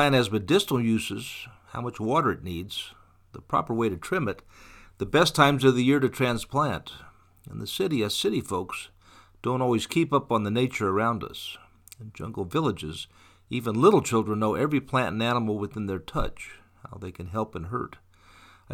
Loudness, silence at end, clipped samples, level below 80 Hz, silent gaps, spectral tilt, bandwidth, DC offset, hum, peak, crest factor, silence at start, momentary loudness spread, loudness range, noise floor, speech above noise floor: -26 LUFS; 0 s; under 0.1%; -50 dBFS; none; -5.5 dB/octave; 18 kHz; under 0.1%; none; -4 dBFS; 22 dB; 0 s; 18 LU; 6 LU; -55 dBFS; 29 dB